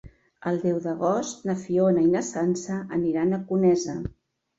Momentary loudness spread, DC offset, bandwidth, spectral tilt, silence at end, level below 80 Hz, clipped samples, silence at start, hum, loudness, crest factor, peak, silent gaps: 9 LU; under 0.1%; 8 kHz; -6.5 dB/octave; 0.5 s; -54 dBFS; under 0.1%; 0.05 s; none; -25 LUFS; 14 dB; -10 dBFS; none